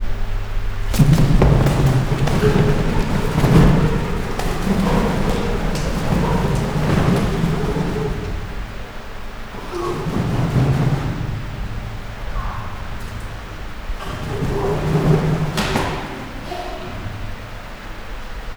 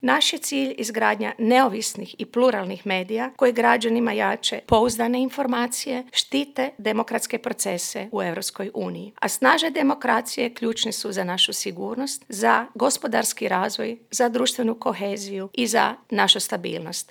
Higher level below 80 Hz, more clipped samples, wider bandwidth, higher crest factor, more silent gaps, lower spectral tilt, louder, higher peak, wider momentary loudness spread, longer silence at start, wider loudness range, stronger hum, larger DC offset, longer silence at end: first, -24 dBFS vs -58 dBFS; neither; about the same, over 20 kHz vs over 20 kHz; about the same, 18 dB vs 22 dB; neither; first, -7 dB/octave vs -2.5 dB/octave; first, -20 LUFS vs -23 LUFS; about the same, 0 dBFS vs -2 dBFS; first, 17 LU vs 10 LU; about the same, 0 s vs 0 s; first, 9 LU vs 3 LU; neither; neither; about the same, 0 s vs 0.05 s